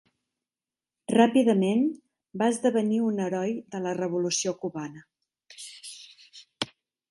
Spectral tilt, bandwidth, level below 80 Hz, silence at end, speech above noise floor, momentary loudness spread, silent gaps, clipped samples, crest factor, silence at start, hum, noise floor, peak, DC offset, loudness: -5 dB/octave; 11.5 kHz; -76 dBFS; 0.45 s; over 65 dB; 21 LU; none; under 0.1%; 22 dB; 1.1 s; none; under -90 dBFS; -6 dBFS; under 0.1%; -26 LUFS